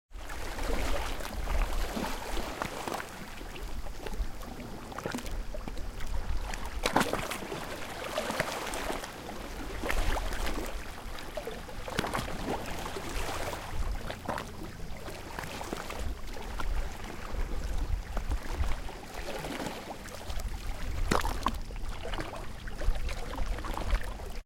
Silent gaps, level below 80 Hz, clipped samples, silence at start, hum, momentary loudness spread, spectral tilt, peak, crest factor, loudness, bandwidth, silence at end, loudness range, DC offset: none; -36 dBFS; under 0.1%; 0.1 s; none; 9 LU; -4 dB/octave; -10 dBFS; 24 dB; -37 LUFS; 17 kHz; 0.05 s; 5 LU; under 0.1%